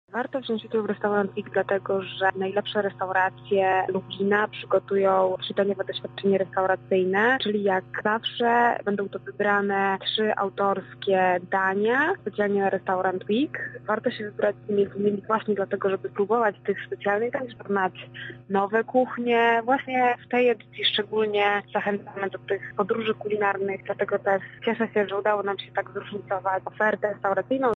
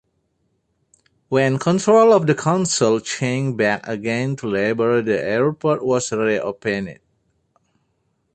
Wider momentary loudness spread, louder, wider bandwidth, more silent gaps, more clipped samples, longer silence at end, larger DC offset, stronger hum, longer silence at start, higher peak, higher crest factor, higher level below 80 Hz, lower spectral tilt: about the same, 7 LU vs 9 LU; second, -25 LUFS vs -19 LUFS; second, 6.6 kHz vs 9 kHz; neither; neither; second, 0 s vs 1.4 s; neither; first, 50 Hz at -65 dBFS vs none; second, 0.15 s vs 1.3 s; second, -8 dBFS vs -2 dBFS; about the same, 16 dB vs 16 dB; second, -68 dBFS vs -58 dBFS; first, -7 dB/octave vs -5 dB/octave